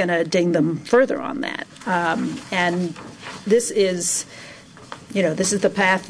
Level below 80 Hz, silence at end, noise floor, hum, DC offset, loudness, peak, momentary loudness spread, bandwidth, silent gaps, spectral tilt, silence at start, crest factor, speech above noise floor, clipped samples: -62 dBFS; 0 s; -40 dBFS; none; under 0.1%; -21 LUFS; -6 dBFS; 17 LU; 11 kHz; none; -4 dB/octave; 0 s; 14 dB; 20 dB; under 0.1%